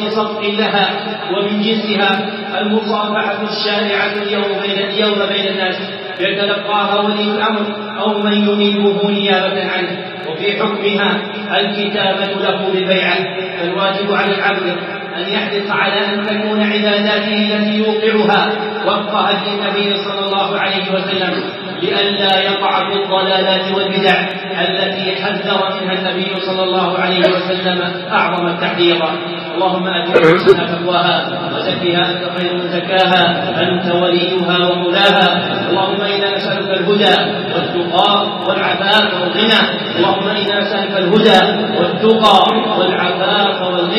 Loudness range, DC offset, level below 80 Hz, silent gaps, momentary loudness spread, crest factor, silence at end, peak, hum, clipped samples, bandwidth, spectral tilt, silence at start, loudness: 3 LU; under 0.1%; -60 dBFS; none; 7 LU; 14 dB; 0 s; 0 dBFS; none; under 0.1%; 10 kHz; -6 dB/octave; 0 s; -14 LUFS